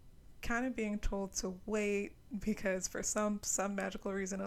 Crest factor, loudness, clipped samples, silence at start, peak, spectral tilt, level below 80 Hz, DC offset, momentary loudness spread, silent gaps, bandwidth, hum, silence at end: 18 dB; -37 LUFS; under 0.1%; 0.05 s; -20 dBFS; -4 dB/octave; -48 dBFS; under 0.1%; 5 LU; none; 15 kHz; none; 0 s